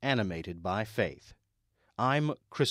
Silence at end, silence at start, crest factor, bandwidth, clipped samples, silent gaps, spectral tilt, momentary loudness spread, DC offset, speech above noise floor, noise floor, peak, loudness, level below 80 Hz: 0 s; 0 s; 18 dB; 15.5 kHz; under 0.1%; none; -5.5 dB/octave; 9 LU; under 0.1%; 44 dB; -75 dBFS; -14 dBFS; -32 LUFS; -60 dBFS